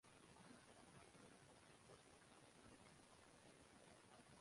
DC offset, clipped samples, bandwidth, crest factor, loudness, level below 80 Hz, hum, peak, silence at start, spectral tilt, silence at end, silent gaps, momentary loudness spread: under 0.1%; under 0.1%; 11.5 kHz; 16 dB; -67 LUFS; -84 dBFS; none; -52 dBFS; 0.05 s; -3.5 dB/octave; 0 s; none; 2 LU